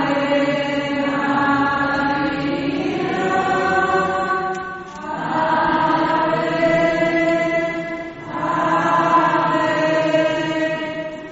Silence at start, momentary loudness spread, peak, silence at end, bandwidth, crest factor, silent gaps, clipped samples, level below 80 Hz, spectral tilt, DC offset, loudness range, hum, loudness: 0 s; 9 LU; -4 dBFS; 0 s; 8 kHz; 16 dB; none; under 0.1%; -50 dBFS; -3.5 dB/octave; under 0.1%; 2 LU; none; -19 LUFS